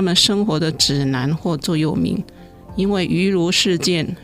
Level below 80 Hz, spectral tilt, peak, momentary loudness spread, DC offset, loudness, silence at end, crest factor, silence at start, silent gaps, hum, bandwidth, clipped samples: -44 dBFS; -4.5 dB/octave; -2 dBFS; 7 LU; under 0.1%; -18 LUFS; 0 s; 16 dB; 0 s; none; none; 16 kHz; under 0.1%